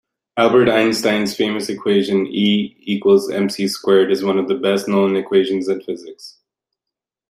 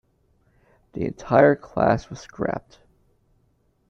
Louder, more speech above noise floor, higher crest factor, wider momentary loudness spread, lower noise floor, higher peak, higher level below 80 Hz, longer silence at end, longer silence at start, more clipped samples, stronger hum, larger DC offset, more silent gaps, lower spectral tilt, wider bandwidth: first, -17 LUFS vs -22 LUFS; first, 68 dB vs 44 dB; second, 16 dB vs 22 dB; second, 8 LU vs 17 LU; first, -85 dBFS vs -65 dBFS; about the same, -2 dBFS vs -2 dBFS; second, -62 dBFS vs -52 dBFS; second, 1 s vs 1.3 s; second, 0.35 s vs 0.95 s; neither; neither; neither; neither; second, -5 dB/octave vs -7.5 dB/octave; first, 14.5 kHz vs 7.4 kHz